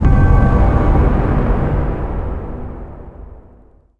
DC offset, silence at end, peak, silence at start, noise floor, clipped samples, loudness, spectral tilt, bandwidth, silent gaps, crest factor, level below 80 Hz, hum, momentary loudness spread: under 0.1%; 0.65 s; 0 dBFS; 0 s; -46 dBFS; under 0.1%; -16 LUFS; -10 dB/octave; 4 kHz; none; 14 dB; -18 dBFS; none; 20 LU